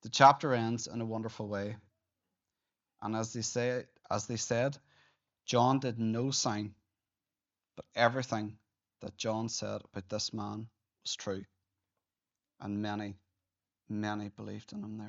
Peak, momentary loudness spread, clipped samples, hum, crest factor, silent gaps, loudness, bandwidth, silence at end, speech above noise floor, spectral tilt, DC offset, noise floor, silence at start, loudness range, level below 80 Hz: -8 dBFS; 15 LU; under 0.1%; none; 26 dB; none; -34 LUFS; 8 kHz; 0 s; over 57 dB; -4 dB/octave; under 0.1%; under -90 dBFS; 0.05 s; 9 LU; -76 dBFS